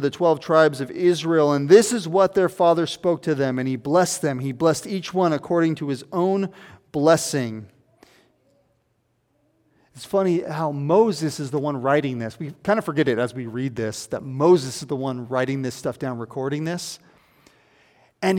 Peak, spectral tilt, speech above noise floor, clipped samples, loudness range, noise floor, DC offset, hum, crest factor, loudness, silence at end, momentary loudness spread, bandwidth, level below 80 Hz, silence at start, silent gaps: -2 dBFS; -5.5 dB/octave; 47 dB; under 0.1%; 9 LU; -69 dBFS; under 0.1%; none; 20 dB; -22 LUFS; 0 s; 11 LU; 17 kHz; -64 dBFS; 0 s; none